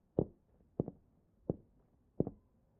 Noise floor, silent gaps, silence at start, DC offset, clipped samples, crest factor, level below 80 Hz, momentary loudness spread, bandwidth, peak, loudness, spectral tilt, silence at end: -71 dBFS; none; 0.15 s; under 0.1%; under 0.1%; 28 dB; -62 dBFS; 7 LU; 2 kHz; -14 dBFS; -43 LUFS; -13 dB/octave; 0.45 s